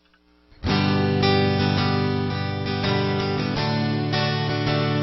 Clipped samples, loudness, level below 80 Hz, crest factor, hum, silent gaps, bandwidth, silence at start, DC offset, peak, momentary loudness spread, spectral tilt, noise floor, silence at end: under 0.1%; -22 LUFS; -46 dBFS; 14 dB; none; none; 6 kHz; 0.6 s; under 0.1%; -8 dBFS; 5 LU; -7.5 dB/octave; -59 dBFS; 0 s